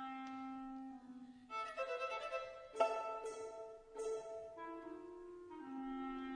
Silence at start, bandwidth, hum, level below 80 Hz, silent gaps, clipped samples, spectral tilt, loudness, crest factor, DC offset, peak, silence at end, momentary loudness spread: 0 s; 10.5 kHz; none; -74 dBFS; none; under 0.1%; -3.5 dB/octave; -46 LUFS; 24 dB; under 0.1%; -22 dBFS; 0 s; 14 LU